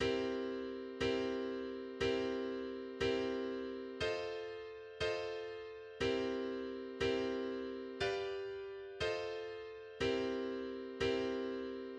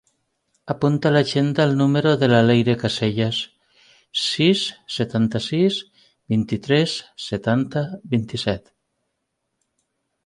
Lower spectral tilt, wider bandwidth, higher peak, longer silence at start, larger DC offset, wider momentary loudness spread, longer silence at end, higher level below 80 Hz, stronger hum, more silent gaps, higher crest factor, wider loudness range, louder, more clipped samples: about the same, -5 dB/octave vs -6 dB/octave; second, 9.4 kHz vs 11.5 kHz; second, -24 dBFS vs -4 dBFS; second, 0 s vs 0.65 s; neither; about the same, 9 LU vs 10 LU; second, 0 s vs 1.65 s; second, -62 dBFS vs -54 dBFS; neither; neither; about the same, 16 dB vs 18 dB; second, 2 LU vs 5 LU; second, -40 LUFS vs -20 LUFS; neither